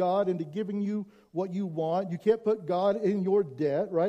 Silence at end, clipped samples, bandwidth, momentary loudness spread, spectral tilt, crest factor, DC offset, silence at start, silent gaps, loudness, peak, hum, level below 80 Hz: 0 s; under 0.1%; 8.2 kHz; 7 LU; -8.5 dB/octave; 16 dB; under 0.1%; 0 s; none; -29 LUFS; -12 dBFS; none; -74 dBFS